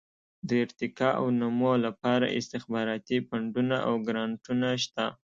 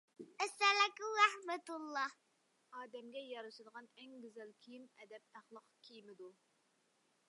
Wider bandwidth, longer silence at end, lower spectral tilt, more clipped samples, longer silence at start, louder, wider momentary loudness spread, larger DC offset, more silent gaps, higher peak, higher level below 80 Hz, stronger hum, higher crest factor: second, 7.6 kHz vs 11.5 kHz; second, 0.25 s vs 0.95 s; first, -5.5 dB/octave vs 0 dB/octave; neither; first, 0.45 s vs 0.2 s; first, -29 LUFS vs -37 LUFS; second, 6 LU vs 26 LU; neither; neither; first, -10 dBFS vs -16 dBFS; first, -70 dBFS vs under -90 dBFS; neither; second, 18 dB vs 26 dB